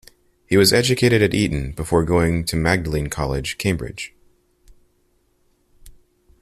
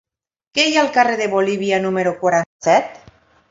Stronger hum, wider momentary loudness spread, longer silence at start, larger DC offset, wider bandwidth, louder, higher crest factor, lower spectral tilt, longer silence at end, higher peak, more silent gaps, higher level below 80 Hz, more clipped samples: neither; first, 11 LU vs 4 LU; about the same, 0.5 s vs 0.55 s; neither; first, 15.5 kHz vs 7.8 kHz; about the same, -19 LUFS vs -17 LUFS; about the same, 18 dB vs 18 dB; about the same, -5 dB/octave vs -4 dB/octave; about the same, 0.5 s vs 0.55 s; about the same, -2 dBFS vs 0 dBFS; second, none vs 2.46-2.59 s; first, -38 dBFS vs -62 dBFS; neither